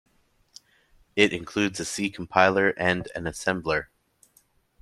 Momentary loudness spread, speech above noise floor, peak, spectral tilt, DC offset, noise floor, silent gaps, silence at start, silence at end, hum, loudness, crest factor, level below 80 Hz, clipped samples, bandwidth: 9 LU; 40 dB; -2 dBFS; -4 dB/octave; under 0.1%; -65 dBFS; none; 1.15 s; 1 s; none; -25 LUFS; 26 dB; -56 dBFS; under 0.1%; 13.5 kHz